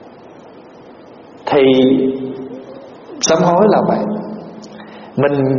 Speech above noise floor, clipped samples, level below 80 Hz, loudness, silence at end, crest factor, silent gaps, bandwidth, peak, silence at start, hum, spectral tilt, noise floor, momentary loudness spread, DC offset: 26 dB; under 0.1%; -54 dBFS; -14 LUFS; 0 s; 16 dB; none; 7.2 kHz; 0 dBFS; 0 s; none; -5.5 dB/octave; -39 dBFS; 23 LU; under 0.1%